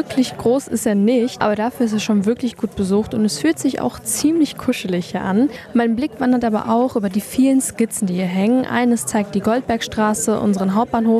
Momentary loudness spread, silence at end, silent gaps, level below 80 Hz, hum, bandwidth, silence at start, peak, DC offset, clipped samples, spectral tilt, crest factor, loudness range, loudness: 4 LU; 0 s; none; -50 dBFS; none; 14 kHz; 0 s; -4 dBFS; under 0.1%; under 0.1%; -5 dB/octave; 12 dB; 1 LU; -18 LUFS